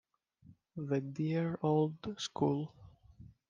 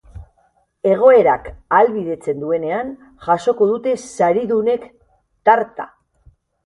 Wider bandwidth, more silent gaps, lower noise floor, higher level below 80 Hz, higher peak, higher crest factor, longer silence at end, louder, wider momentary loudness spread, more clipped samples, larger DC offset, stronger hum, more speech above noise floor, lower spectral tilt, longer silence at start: second, 9.2 kHz vs 11.5 kHz; neither; about the same, -63 dBFS vs -60 dBFS; second, -70 dBFS vs -50 dBFS; second, -18 dBFS vs 0 dBFS; about the same, 18 dB vs 18 dB; second, 0.2 s vs 0.8 s; second, -35 LUFS vs -17 LUFS; about the same, 13 LU vs 12 LU; neither; neither; neither; second, 29 dB vs 44 dB; about the same, -7 dB/octave vs -6 dB/octave; first, 0.5 s vs 0.15 s